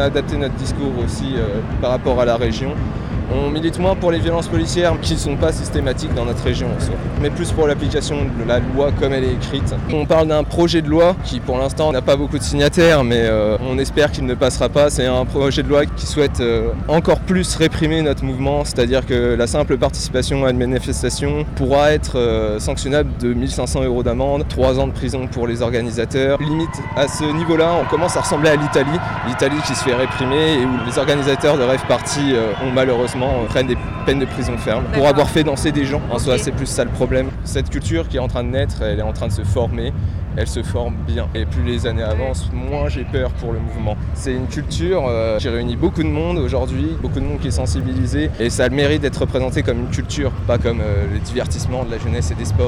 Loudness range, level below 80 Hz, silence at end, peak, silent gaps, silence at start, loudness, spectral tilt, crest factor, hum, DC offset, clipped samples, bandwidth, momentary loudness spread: 5 LU; -26 dBFS; 0 s; -6 dBFS; none; 0 s; -18 LUFS; -5.5 dB/octave; 12 dB; none; under 0.1%; under 0.1%; 14.5 kHz; 7 LU